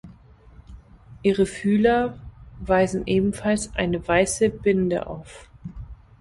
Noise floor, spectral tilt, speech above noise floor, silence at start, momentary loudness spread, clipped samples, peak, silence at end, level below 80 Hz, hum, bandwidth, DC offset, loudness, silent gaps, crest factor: -49 dBFS; -5.5 dB/octave; 27 dB; 0.05 s; 21 LU; under 0.1%; -4 dBFS; 0.25 s; -44 dBFS; none; 11.5 kHz; under 0.1%; -22 LUFS; none; 18 dB